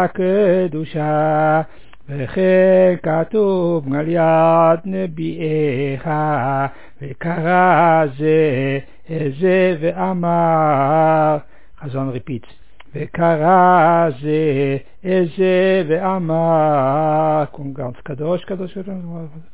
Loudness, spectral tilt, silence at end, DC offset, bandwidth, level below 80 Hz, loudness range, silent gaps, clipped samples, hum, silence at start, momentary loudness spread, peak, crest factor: -16 LUFS; -11.5 dB/octave; 0.15 s; 2%; 4 kHz; -52 dBFS; 3 LU; none; under 0.1%; none; 0 s; 15 LU; -2 dBFS; 14 dB